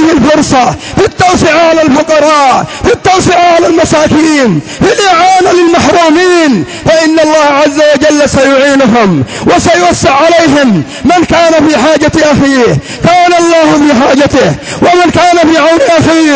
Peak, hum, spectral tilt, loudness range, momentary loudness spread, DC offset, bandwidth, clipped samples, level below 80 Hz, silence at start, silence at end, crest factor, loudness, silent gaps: 0 dBFS; none; -4.5 dB/octave; 1 LU; 4 LU; under 0.1%; 8 kHz; 0.7%; -30 dBFS; 0 s; 0 s; 6 dB; -5 LUFS; none